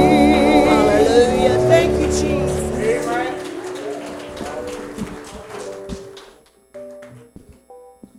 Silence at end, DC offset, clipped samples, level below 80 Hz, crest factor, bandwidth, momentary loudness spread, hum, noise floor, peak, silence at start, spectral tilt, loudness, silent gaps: 0.4 s; under 0.1%; under 0.1%; -36 dBFS; 18 dB; 15 kHz; 21 LU; none; -49 dBFS; 0 dBFS; 0 s; -5.5 dB/octave; -16 LUFS; none